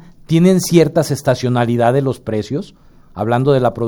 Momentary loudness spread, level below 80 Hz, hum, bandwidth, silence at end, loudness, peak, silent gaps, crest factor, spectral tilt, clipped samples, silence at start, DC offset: 10 LU; -46 dBFS; none; over 20 kHz; 0 s; -15 LUFS; 0 dBFS; none; 14 dB; -6.5 dB/octave; under 0.1%; 0.3 s; under 0.1%